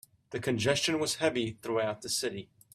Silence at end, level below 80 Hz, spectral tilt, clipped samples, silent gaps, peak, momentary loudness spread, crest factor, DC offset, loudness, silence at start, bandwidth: 0.3 s; -66 dBFS; -3.5 dB/octave; under 0.1%; none; -12 dBFS; 9 LU; 20 dB; under 0.1%; -31 LUFS; 0.3 s; 15.5 kHz